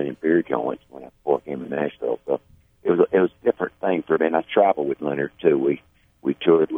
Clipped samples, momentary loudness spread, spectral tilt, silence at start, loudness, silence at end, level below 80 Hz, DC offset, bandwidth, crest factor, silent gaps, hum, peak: under 0.1%; 10 LU; -9 dB/octave; 0 s; -23 LUFS; 0 s; -62 dBFS; under 0.1%; 3.7 kHz; 18 dB; none; none; -4 dBFS